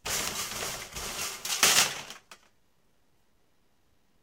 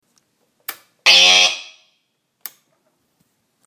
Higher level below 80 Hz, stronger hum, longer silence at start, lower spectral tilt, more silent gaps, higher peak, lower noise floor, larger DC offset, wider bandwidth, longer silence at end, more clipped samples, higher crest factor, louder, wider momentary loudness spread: first, -58 dBFS vs -80 dBFS; neither; second, 0.05 s vs 0.7 s; first, 0.5 dB/octave vs 2 dB/octave; neither; second, -4 dBFS vs 0 dBFS; about the same, -71 dBFS vs -69 dBFS; neither; about the same, 18 kHz vs 19.5 kHz; second, 1.85 s vs 2.05 s; neither; first, 28 dB vs 20 dB; second, -27 LUFS vs -10 LUFS; second, 18 LU vs 28 LU